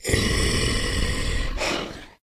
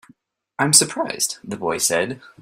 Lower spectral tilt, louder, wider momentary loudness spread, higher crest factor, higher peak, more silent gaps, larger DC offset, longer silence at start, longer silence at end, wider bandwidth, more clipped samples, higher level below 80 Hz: first, -3.5 dB/octave vs -2 dB/octave; second, -24 LUFS vs -19 LUFS; second, 6 LU vs 13 LU; about the same, 18 dB vs 22 dB; second, -6 dBFS vs 0 dBFS; neither; neither; second, 0 s vs 0.6 s; about the same, 0.15 s vs 0.15 s; about the same, 15.5 kHz vs 16 kHz; neither; first, -28 dBFS vs -62 dBFS